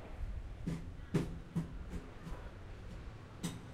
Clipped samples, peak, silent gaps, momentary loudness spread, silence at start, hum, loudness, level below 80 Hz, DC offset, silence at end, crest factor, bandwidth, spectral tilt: under 0.1%; -22 dBFS; none; 12 LU; 0 s; none; -45 LUFS; -48 dBFS; under 0.1%; 0 s; 22 dB; 13.5 kHz; -6.5 dB/octave